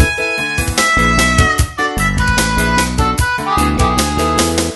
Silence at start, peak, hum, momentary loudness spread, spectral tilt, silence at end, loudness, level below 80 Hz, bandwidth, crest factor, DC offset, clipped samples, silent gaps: 0 s; 0 dBFS; none; 5 LU; -4 dB/octave; 0 s; -13 LUFS; -22 dBFS; 12.5 kHz; 14 dB; under 0.1%; under 0.1%; none